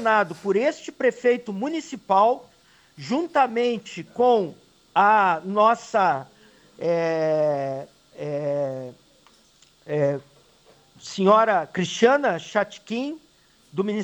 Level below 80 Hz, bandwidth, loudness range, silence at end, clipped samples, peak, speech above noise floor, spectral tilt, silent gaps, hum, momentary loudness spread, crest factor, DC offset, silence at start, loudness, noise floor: -70 dBFS; 19 kHz; 6 LU; 0 s; under 0.1%; -4 dBFS; 36 dB; -5.5 dB/octave; none; none; 15 LU; 18 dB; under 0.1%; 0 s; -23 LUFS; -58 dBFS